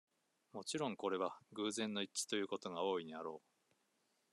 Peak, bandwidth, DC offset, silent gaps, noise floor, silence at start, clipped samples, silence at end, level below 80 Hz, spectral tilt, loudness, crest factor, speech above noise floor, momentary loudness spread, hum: -24 dBFS; 12.5 kHz; under 0.1%; none; -81 dBFS; 0.55 s; under 0.1%; 0.95 s; under -90 dBFS; -3 dB/octave; -42 LUFS; 20 dB; 39 dB; 9 LU; none